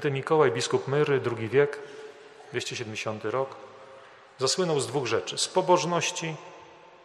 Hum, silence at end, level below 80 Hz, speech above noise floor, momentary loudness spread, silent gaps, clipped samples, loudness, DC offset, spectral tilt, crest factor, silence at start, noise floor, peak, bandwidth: none; 0.3 s; -72 dBFS; 23 dB; 19 LU; none; under 0.1%; -27 LUFS; under 0.1%; -4 dB/octave; 20 dB; 0 s; -50 dBFS; -8 dBFS; 13 kHz